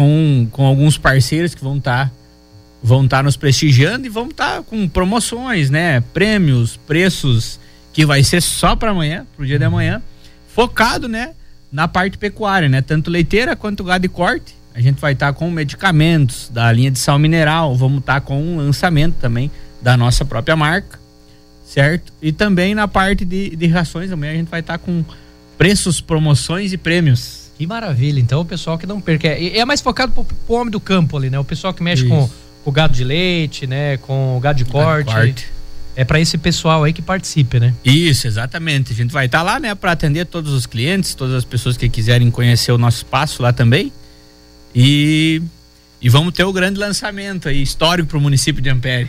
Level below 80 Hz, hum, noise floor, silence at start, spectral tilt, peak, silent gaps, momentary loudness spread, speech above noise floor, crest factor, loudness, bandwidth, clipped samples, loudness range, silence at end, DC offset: -30 dBFS; none; -43 dBFS; 0 s; -5.5 dB/octave; -2 dBFS; none; 9 LU; 29 dB; 14 dB; -15 LUFS; 15.5 kHz; under 0.1%; 3 LU; 0 s; under 0.1%